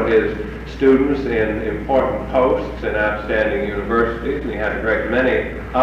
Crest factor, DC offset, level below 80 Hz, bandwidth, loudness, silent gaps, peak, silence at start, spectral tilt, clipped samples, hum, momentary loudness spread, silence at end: 16 dB; under 0.1%; -32 dBFS; 7.6 kHz; -19 LUFS; none; -4 dBFS; 0 s; -7.5 dB/octave; under 0.1%; none; 7 LU; 0 s